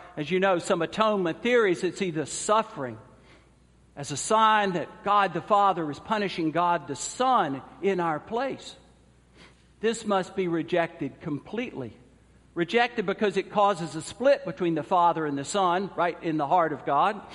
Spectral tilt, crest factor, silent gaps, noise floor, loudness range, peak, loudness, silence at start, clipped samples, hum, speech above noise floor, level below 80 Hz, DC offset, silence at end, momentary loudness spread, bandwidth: -4.5 dB/octave; 18 dB; none; -58 dBFS; 6 LU; -8 dBFS; -26 LUFS; 0 s; under 0.1%; none; 32 dB; -62 dBFS; under 0.1%; 0 s; 11 LU; 11.5 kHz